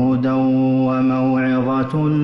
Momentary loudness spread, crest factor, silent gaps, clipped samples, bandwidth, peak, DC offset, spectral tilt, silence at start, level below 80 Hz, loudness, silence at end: 2 LU; 8 dB; none; under 0.1%; 5.6 kHz; -10 dBFS; under 0.1%; -10 dB/octave; 0 s; -52 dBFS; -17 LUFS; 0 s